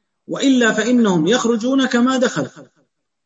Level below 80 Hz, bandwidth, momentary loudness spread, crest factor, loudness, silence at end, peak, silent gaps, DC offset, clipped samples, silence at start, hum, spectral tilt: -64 dBFS; 8 kHz; 9 LU; 16 dB; -16 LUFS; 0.6 s; -2 dBFS; none; under 0.1%; under 0.1%; 0.3 s; none; -4.5 dB/octave